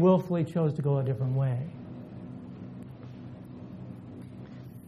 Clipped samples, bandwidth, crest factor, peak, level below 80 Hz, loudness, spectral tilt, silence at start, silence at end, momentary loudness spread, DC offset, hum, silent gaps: under 0.1%; 5 kHz; 20 dB; -12 dBFS; -62 dBFS; -28 LUFS; -10 dB/octave; 0 s; 0 s; 17 LU; under 0.1%; none; none